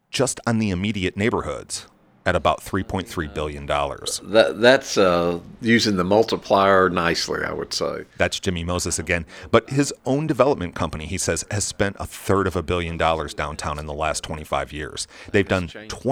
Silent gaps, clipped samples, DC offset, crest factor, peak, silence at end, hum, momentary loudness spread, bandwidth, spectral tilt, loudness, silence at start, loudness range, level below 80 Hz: none; under 0.1%; under 0.1%; 22 dB; 0 dBFS; 0 s; none; 11 LU; 19 kHz; -4.5 dB/octave; -22 LUFS; 0.15 s; 6 LU; -42 dBFS